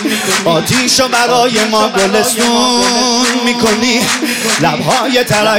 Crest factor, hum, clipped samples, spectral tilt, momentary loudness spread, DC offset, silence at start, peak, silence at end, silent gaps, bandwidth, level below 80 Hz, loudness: 12 dB; none; under 0.1%; -2.5 dB/octave; 2 LU; under 0.1%; 0 s; 0 dBFS; 0 s; none; 17 kHz; -46 dBFS; -10 LUFS